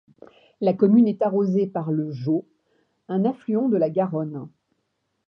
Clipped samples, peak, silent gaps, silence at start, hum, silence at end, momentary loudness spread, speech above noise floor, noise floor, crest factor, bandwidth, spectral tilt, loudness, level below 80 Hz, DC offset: under 0.1%; -6 dBFS; none; 0.6 s; none; 0.8 s; 10 LU; 53 dB; -74 dBFS; 18 dB; 5.8 kHz; -11 dB/octave; -22 LUFS; -74 dBFS; under 0.1%